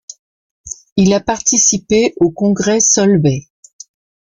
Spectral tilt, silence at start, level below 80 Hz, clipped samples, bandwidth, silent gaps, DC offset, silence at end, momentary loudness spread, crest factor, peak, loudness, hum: -4 dB/octave; 0.65 s; -46 dBFS; under 0.1%; 10 kHz; 0.92-0.96 s; under 0.1%; 0.85 s; 12 LU; 14 dB; 0 dBFS; -13 LUFS; none